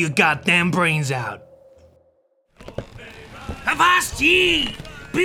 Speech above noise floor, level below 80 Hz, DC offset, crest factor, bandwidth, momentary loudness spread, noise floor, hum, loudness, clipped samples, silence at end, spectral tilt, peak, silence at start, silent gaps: 43 dB; -44 dBFS; under 0.1%; 20 dB; 17.5 kHz; 22 LU; -62 dBFS; none; -18 LUFS; under 0.1%; 0 s; -3.5 dB/octave; -2 dBFS; 0 s; none